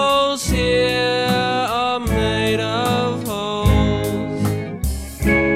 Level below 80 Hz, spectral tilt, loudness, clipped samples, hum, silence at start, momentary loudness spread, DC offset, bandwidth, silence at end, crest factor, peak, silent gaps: -28 dBFS; -5 dB/octave; -19 LUFS; under 0.1%; none; 0 s; 6 LU; under 0.1%; 16 kHz; 0 s; 14 dB; -4 dBFS; none